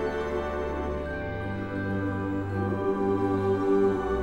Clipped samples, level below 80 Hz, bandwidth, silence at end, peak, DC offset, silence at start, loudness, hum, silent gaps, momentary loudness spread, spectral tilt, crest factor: under 0.1%; -44 dBFS; 8.4 kHz; 0 s; -14 dBFS; 0.4%; 0 s; -28 LUFS; none; none; 8 LU; -8.5 dB/octave; 14 dB